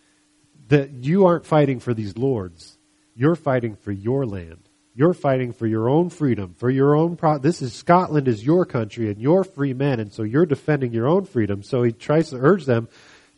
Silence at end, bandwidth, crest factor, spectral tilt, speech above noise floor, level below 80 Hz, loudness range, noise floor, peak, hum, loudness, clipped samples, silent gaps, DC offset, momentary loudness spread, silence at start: 0.5 s; 11 kHz; 20 dB; -8.5 dB/octave; 40 dB; -58 dBFS; 4 LU; -60 dBFS; -2 dBFS; none; -21 LUFS; under 0.1%; none; under 0.1%; 7 LU; 0.7 s